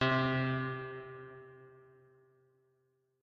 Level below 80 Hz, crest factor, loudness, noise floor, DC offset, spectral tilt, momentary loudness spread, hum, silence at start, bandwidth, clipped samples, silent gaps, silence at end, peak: -70 dBFS; 20 dB; -35 LUFS; -77 dBFS; under 0.1%; -4.5 dB/octave; 24 LU; none; 0 s; 6.4 kHz; under 0.1%; none; 1.45 s; -18 dBFS